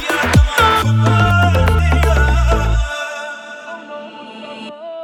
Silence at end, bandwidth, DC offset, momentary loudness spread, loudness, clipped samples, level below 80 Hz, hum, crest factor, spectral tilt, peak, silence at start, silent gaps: 0 s; 17.5 kHz; under 0.1%; 18 LU; -14 LUFS; under 0.1%; -20 dBFS; none; 14 dB; -5.5 dB/octave; 0 dBFS; 0 s; none